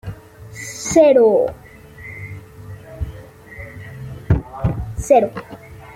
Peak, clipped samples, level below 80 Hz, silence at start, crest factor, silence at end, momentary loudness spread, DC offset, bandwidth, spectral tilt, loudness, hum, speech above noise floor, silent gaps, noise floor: -2 dBFS; under 0.1%; -36 dBFS; 0.05 s; 18 dB; 0.05 s; 25 LU; under 0.1%; 16.5 kHz; -6 dB/octave; -16 LUFS; none; 25 dB; none; -38 dBFS